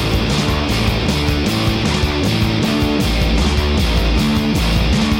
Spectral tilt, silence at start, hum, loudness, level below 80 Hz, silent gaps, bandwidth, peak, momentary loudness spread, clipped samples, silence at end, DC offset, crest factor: -5.5 dB/octave; 0 s; none; -16 LUFS; -20 dBFS; none; 16.5 kHz; -4 dBFS; 1 LU; under 0.1%; 0 s; under 0.1%; 12 dB